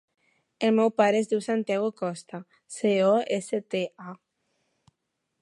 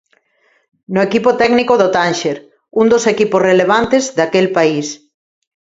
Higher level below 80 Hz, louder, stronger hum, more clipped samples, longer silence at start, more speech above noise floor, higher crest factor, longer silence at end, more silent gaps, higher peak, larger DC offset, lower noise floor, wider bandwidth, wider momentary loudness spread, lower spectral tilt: second, -80 dBFS vs -52 dBFS; second, -26 LUFS vs -13 LUFS; neither; neither; second, 0.6 s vs 0.9 s; first, 55 dB vs 46 dB; first, 20 dB vs 14 dB; first, 1.25 s vs 0.8 s; neither; second, -8 dBFS vs 0 dBFS; neither; first, -80 dBFS vs -58 dBFS; first, 11.5 kHz vs 8 kHz; first, 20 LU vs 10 LU; about the same, -5.5 dB/octave vs -4.5 dB/octave